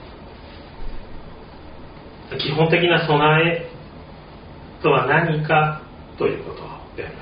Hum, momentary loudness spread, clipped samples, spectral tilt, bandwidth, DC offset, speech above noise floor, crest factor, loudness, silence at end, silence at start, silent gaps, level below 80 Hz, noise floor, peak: none; 25 LU; under 0.1%; -4 dB/octave; 5.2 kHz; under 0.1%; 21 dB; 20 dB; -18 LUFS; 0 s; 0 s; none; -42 dBFS; -40 dBFS; -2 dBFS